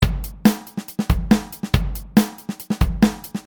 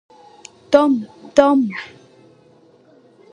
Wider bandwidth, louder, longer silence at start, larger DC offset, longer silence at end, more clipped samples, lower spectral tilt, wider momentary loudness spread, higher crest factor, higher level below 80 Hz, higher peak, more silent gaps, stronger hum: first, 19.5 kHz vs 10.5 kHz; second, -21 LUFS vs -16 LUFS; second, 0 s vs 0.7 s; neither; second, 0.05 s vs 1.45 s; neither; about the same, -6 dB/octave vs -5.5 dB/octave; second, 9 LU vs 15 LU; about the same, 20 dB vs 20 dB; first, -28 dBFS vs -60 dBFS; about the same, 0 dBFS vs 0 dBFS; neither; neither